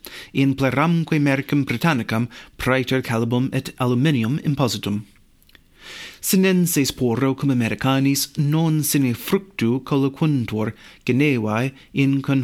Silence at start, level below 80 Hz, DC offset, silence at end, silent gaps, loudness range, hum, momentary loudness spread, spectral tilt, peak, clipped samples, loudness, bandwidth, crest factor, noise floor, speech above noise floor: 0.05 s; -50 dBFS; under 0.1%; 0 s; none; 2 LU; none; 7 LU; -5.5 dB/octave; -6 dBFS; under 0.1%; -20 LUFS; 17 kHz; 16 dB; -53 dBFS; 33 dB